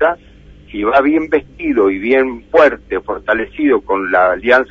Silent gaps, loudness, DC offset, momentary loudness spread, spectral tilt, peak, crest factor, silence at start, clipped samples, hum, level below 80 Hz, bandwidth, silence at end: none; -14 LUFS; under 0.1%; 9 LU; -6.5 dB/octave; 0 dBFS; 14 dB; 0 s; under 0.1%; none; -42 dBFS; 7.2 kHz; 0.05 s